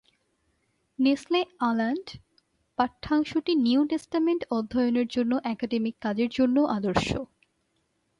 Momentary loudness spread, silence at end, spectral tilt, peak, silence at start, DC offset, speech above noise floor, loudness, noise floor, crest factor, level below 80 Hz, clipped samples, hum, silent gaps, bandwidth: 7 LU; 0.95 s; -6 dB/octave; -10 dBFS; 1 s; under 0.1%; 48 dB; -26 LUFS; -73 dBFS; 18 dB; -54 dBFS; under 0.1%; none; none; 11.5 kHz